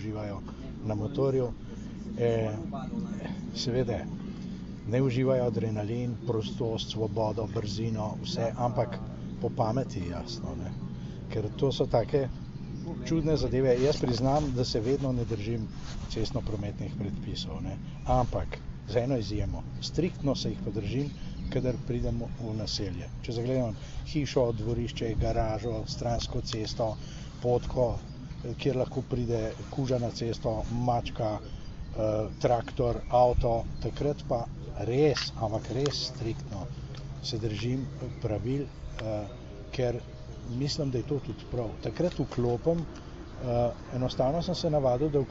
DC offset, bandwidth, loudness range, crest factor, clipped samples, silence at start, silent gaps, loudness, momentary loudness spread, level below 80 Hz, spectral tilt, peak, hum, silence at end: under 0.1%; 8 kHz; 5 LU; 18 dB; under 0.1%; 0 s; none; -31 LUFS; 12 LU; -42 dBFS; -6.5 dB/octave; -12 dBFS; none; 0 s